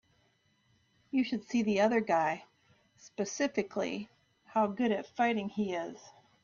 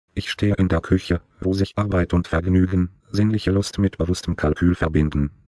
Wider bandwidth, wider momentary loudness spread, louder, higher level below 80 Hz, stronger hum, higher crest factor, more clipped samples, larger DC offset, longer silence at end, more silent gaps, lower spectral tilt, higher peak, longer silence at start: second, 7.4 kHz vs 11 kHz; first, 14 LU vs 5 LU; second, -32 LUFS vs -21 LUFS; second, -74 dBFS vs -34 dBFS; neither; about the same, 18 dB vs 16 dB; neither; neither; about the same, 0.35 s vs 0.3 s; neither; second, -5 dB/octave vs -7 dB/octave; second, -16 dBFS vs -6 dBFS; first, 1.15 s vs 0.15 s